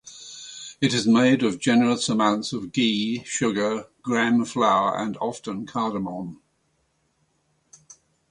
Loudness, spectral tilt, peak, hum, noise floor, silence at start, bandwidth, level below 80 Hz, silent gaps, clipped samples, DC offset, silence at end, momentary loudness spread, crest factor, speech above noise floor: -23 LUFS; -4.5 dB/octave; -6 dBFS; none; -69 dBFS; 0.05 s; 11 kHz; -64 dBFS; none; under 0.1%; under 0.1%; 1.95 s; 15 LU; 18 dB; 47 dB